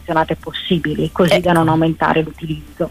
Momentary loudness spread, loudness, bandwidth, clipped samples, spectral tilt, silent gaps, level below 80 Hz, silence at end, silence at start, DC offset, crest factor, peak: 11 LU; -16 LUFS; 15.5 kHz; under 0.1%; -6.5 dB/octave; none; -38 dBFS; 0 s; 0 s; under 0.1%; 14 dB; -2 dBFS